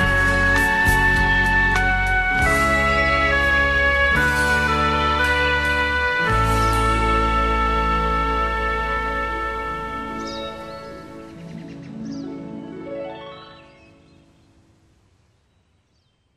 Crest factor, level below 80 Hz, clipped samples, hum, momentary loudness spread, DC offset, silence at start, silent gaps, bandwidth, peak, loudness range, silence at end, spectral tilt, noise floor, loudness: 16 dB; -28 dBFS; under 0.1%; none; 18 LU; under 0.1%; 0 s; none; 13 kHz; -4 dBFS; 18 LU; 2.75 s; -4.5 dB/octave; -64 dBFS; -18 LUFS